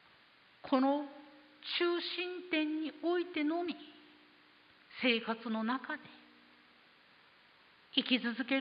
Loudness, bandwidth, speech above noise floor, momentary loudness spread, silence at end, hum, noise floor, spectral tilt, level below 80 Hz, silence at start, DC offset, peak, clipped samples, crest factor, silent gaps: -35 LUFS; 5.2 kHz; 30 dB; 17 LU; 0 s; none; -64 dBFS; -1 dB/octave; -86 dBFS; 0.65 s; under 0.1%; -14 dBFS; under 0.1%; 22 dB; none